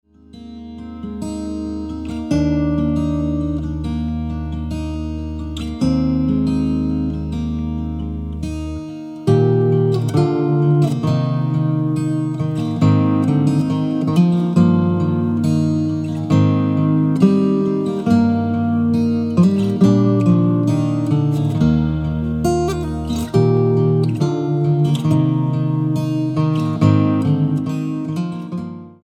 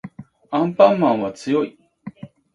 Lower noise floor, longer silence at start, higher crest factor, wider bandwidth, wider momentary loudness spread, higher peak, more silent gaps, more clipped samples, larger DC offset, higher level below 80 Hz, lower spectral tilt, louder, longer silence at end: about the same, -38 dBFS vs -39 dBFS; first, 0.35 s vs 0.05 s; about the same, 16 dB vs 20 dB; about the same, 10.5 kHz vs 10.5 kHz; second, 11 LU vs 25 LU; about the same, -2 dBFS vs 0 dBFS; neither; neither; neither; first, -34 dBFS vs -64 dBFS; first, -8.5 dB/octave vs -7 dB/octave; about the same, -18 LUFS vs -19 LUFS; second, 0.15 s vs 0.3 s